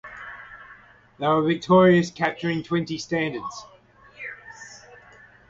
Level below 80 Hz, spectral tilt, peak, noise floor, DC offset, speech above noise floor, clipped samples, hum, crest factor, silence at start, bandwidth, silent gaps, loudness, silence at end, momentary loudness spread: -60 dBFS; -6.5 dB/octave; -6 dBFS; -51 dBFS; under 0.1%; 29 dB; under 0.1%; 50 Hz at -60 dBFS; 20 dB; 0.05 s; 7.8 kHz; none; -22 LUFS; 0.7 s; 24 LU